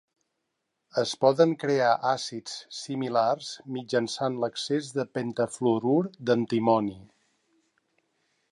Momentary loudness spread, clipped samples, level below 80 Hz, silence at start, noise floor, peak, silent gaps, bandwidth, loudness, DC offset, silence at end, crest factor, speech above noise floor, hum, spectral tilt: 11 LU; under 0.1%; -72 dBFS; 0.95 s; -81 dBFS; -8 dBFS; none; 11 kHz; -27 LUFS; under 0.1%; 1.5 s; 20 dB; 54 dB; none; -5 dB/octave